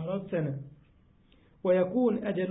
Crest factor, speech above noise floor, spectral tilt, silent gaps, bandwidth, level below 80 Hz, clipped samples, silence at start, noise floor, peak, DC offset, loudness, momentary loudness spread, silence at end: 16 dB; 33 dB; -11.5 dB/octave; none; 4 kHz; -66 dBFS; under 0.1%; 0 s; -62 dBFS; -16 dBFS; under 0.1%; -29 LUFS; 13 LU; 0 s